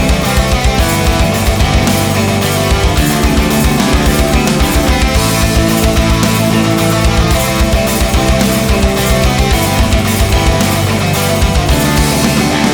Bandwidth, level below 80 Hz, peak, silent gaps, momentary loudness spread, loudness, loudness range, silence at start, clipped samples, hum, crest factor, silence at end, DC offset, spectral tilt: over 20 kHz; -16 dBFS; 0 dBFS; none; 1 LU; -11 LUFS; 1 LU; 0 s; under 0.1%; none; 10 dB; 0 s; under 0.1%; -4.5 dB/octave